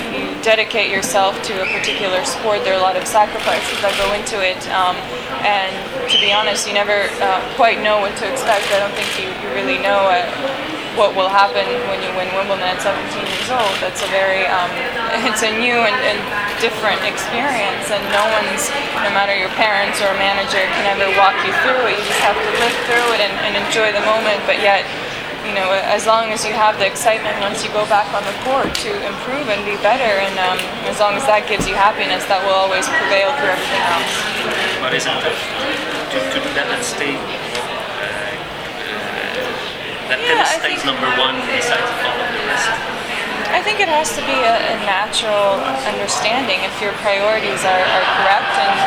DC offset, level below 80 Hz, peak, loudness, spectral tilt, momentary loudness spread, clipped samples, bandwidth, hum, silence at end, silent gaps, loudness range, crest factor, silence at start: under 0.1%; -46 dBFS; 0 dBFS; -16 LUFS; -2 dB/octave; 7 LU; under 0.1%; over 20 kHz; none; 0 s; none; 3 LU; 16 dB; 0 s